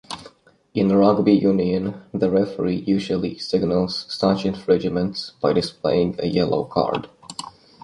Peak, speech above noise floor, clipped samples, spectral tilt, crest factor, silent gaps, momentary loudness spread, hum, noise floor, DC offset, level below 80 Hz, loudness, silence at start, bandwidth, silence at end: -2 dBFS; 29 dB; under 0.1%; -7 dB/octave; 18 dB; none; 13 LU; none; -49 dBFS; under 0.1%; -50 dBFS; -21 LUFS; 0.1 s; 11.5 kHz; 0.35 s